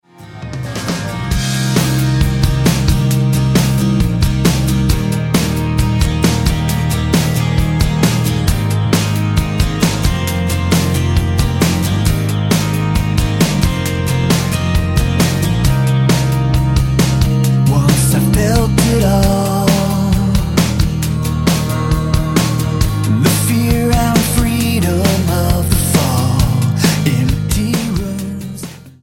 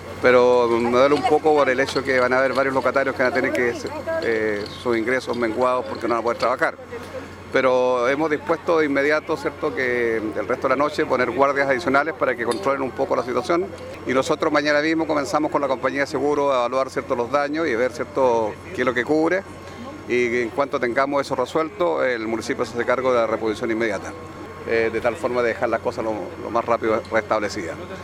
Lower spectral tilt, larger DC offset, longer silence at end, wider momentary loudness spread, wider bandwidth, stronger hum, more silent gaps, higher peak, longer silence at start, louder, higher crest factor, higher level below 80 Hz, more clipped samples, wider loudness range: about the same, -5.5 dB/octave vs -5 dB/octave; neither; about the same, 0.1 s vs 0 s; second, 4 LU vs 7 LU; first, 17 kHz vs 14 kHz; neither; neither; about the same, 0 dBFS vs -2 dBFS; first, 0.2 s vs 0 s; first, -14 LUFS vs -21 LUFS; second, 14 dB vs 20 dB; first, -22 dBFS vs -56 dBFS; neither; about the same, 2 LU vs 3 LU